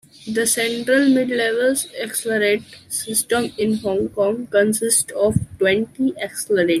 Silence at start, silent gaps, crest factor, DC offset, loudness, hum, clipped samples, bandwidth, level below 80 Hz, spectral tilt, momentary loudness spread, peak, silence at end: 0.2 s; none; 16 dB; under 0.1%; -19 LUFS; none; under 0.1%; 16 kHz; -52 dBFS; -3.5 dB/octave; 7 LU; -4 dBFS; 0 s